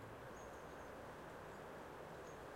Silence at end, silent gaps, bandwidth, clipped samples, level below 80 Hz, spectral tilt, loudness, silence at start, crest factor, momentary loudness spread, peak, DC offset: 0 s; none; 16 kHz; under 0.1%; -70 dBFS; -5 dB/octave; -54 LUFS; 0 s; 12 dB; 0 LU; -42 dBFS; under 0.1%